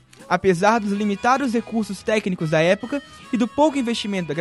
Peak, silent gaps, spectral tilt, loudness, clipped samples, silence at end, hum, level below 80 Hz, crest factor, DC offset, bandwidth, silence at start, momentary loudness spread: -4 dBFS; none; -5.5 dB/octave; -21 LUFS; under 0.1%; 0 s; none; -56 dBFS; 16 dB; under 0.1%; 12 kHz; 0.2 s; 7 LU